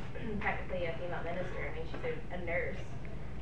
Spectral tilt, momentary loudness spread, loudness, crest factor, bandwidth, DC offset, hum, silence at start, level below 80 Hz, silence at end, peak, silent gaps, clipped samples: -7 dB/octave; 8 LU; -39 LUFS; 18 dB; 10.5 kHz; 1%; none; 0 s; -48 dBFS; 0 s; -20 dBFS; none; under 0.1%